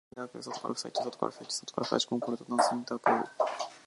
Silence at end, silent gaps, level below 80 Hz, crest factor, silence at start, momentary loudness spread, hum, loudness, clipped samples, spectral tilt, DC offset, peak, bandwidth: 0.05 s; none; -80 dBFS; 22 dB; 0.15 s; 9 LU; none; -32 LUFS; under 0.1%; -3.5 dB/octave; under 0.1%; -10 dBFS; 11.5 kHz